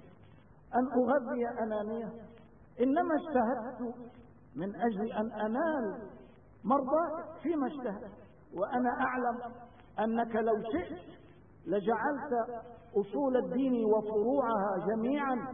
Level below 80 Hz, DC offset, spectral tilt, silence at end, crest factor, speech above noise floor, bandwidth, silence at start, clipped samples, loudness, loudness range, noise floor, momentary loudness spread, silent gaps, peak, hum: -66 dBFS; under 0.1%; -10 dB/octave; 0 s; 16 dB; 26 dB; 3.7 kHz; 0.05 s; under 0.1%; -33 LUFS; 3 LU; -58 dBFS; 15 LU; none; -16 dBFS; 50 Hz at -65 dBFS